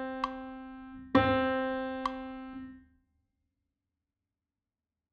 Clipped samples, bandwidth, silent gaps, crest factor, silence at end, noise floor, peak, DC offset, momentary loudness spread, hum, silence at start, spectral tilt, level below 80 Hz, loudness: under 0.1%; 7 kHz; none; 26 dB; 2.3 s; under -90 dBFS; -10 dBFS; under 0.1%; 19 LU; none; 0 s; -7 dB/octave; -58 dBFS; -32 LUFS